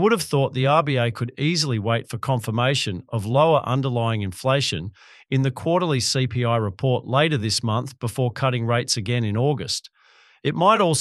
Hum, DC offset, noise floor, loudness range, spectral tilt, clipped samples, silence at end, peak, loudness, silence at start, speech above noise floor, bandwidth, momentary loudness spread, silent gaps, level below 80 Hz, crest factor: none; under 0.1%; -55 dBFS; 1 LU; -5 dB/octave; under 0.1%; 0 s; -2 dBFS; -22 LUFS; 0 s; 34 dB; 12.5 kHz; 7 LU; none; -56 dBFS; 18 dB